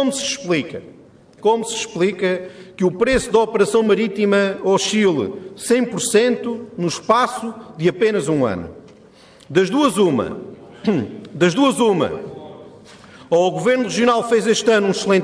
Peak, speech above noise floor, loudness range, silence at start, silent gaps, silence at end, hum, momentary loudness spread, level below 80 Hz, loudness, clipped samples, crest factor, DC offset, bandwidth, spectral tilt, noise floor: -2 dBFS; 29 dB; 3 LU; 0 s; none; 0 s; none; 13 LU; -50 dBFS; -18 LUFS; under 0.1%; 16 dB; under 0.1%; 11 kHz; -4.5 dB/octave; -46 dBFS